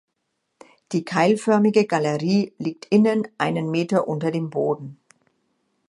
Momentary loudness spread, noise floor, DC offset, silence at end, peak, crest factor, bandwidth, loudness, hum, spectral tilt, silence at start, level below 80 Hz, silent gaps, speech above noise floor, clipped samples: 10 LU; -76 dBFS; under 0.1%; 0.95 s; -4 dBFS; 18 dB; 11.5 kHz; -21 LUFS; none; -6.5 dB/octave; 0.9 s; -70 dBFS; none; 55 dB; under 0.1%